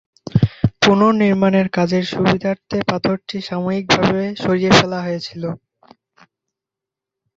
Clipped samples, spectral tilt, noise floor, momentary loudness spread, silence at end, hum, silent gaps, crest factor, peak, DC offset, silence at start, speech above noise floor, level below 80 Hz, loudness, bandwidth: under 0.1%; -5.5 dB/octave; -86 dBFS; 12 LU; 1.8 s; none; none; 18 dB; 0 dBFS; under 0.1%; 0.35 s; 69 dB; -44 dBFS; -17 LUFS; 7.8 kHz